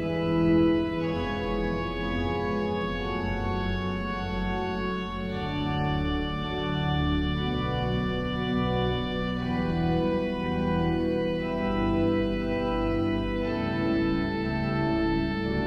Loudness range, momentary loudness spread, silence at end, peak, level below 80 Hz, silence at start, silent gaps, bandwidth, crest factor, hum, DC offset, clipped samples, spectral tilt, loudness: 3 LU; 5 LU; 0 s; -14 dBFS; -38 dBFS; 0 s; none; 7 kHz; 14 dB; none; under 0.1%; under 0.1%; -8 dB/octave; -28 LUFS